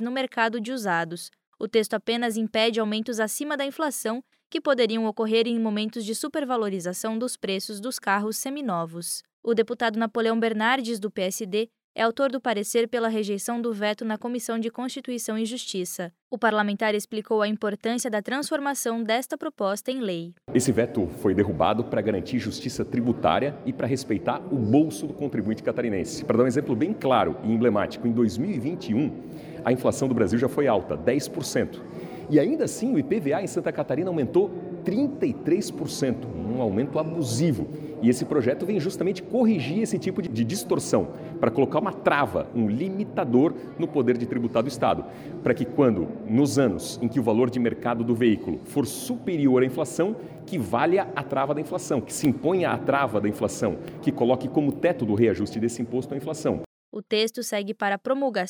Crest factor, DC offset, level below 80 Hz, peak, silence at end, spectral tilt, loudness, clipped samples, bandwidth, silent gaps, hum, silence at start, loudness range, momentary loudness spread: 18 dB; under 0.1%; -58 dBFS; -8 dBFS; 0 s; -5 dB/octave; -25 LUFS; under 0.1%; over 20 kHz; 1.47-1.53 s, 4.46-4.50 s, 9.33-9.43 s, 11.84-11.95 s, 16.22-16.31 s, 56.66-56.92 s; none; 0 s; 3 LU; 7 LU